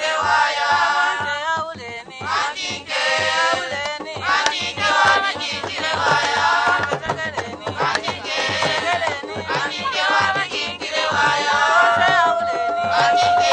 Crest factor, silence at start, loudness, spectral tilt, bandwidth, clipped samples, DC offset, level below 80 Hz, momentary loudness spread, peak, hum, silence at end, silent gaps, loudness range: 18 dB; 0 s; -19 LUFS; -2 dB/octave; 9.6 kHz; under 0.1%; under 0.1%; -56 dBFS; 9 LU; 0 dBFS; none; 0 s; none; 4 LU